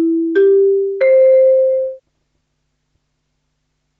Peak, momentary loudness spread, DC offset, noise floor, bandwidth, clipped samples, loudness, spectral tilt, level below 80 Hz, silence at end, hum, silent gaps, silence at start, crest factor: -4 dBFS; 7 LU; under 0.1%; -69 dBFS; 4.3 kHz; under 0.1%; -12 LUFS; -7 dB/octave; -70 dBFS; 2 s; none; none; 0 s; 10 dB